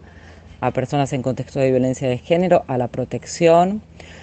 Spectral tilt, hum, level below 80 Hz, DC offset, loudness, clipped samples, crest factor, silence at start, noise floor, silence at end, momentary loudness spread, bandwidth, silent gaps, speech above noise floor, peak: -6.5 dB/octave; none; -48 dBFS; under 0.1%; -19 LUFS; under 0.1%; 18 dB; 0.15 s; -42 dBFS; 0 s; 10 LU; 8.8 kHz; none; 23 dB; -2 dBFS